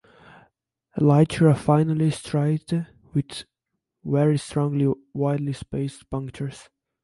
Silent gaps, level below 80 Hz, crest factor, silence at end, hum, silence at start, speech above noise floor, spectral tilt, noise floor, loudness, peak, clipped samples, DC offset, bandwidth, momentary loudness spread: none; -54 dBFS; 18 dB; 0.4 s; none; 0.95 s; 59 dB; -7.5 dB/octave; -81 dBFS; -23 LUFS; -4 dBFS; under 0.1%; under 0.1%; 11.5 kHz; 15 LU